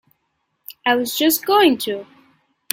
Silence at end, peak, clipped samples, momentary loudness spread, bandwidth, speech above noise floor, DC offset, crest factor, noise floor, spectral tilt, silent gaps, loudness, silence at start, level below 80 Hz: 0.7 s; 0 dBFS; under 0.1%; 14 LU; 17 kHz; 54 dB; under 0.1%; 20 dB; -71 dBFS; -2 dB/octave; none; -17 LUFS; 0.7 s; -64 dBFS